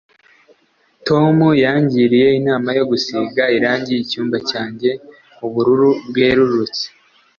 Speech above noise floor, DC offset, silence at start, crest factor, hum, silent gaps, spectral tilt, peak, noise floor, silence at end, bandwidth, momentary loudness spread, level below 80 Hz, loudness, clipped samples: 43 dB; under 0.1%; 1.05 s; 14 dB; none; none; -6.5 dB/octave; -2 dBFS; -58 dBFS; 0.5 s; 7 kHz; 10 LU; -52 dBFS; -15 LUFS; under 0.1%